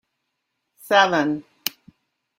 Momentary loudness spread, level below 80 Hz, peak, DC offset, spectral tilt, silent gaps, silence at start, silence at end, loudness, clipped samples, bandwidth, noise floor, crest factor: 13 LU; -70 dBFS; 0 dBFS; under 0.1%; -3.5 dB/octave; none; 0.85 s; 0.7 s; -21 LUFS; under 0.1%; 16 kHz; -77 dBFS; 24 dB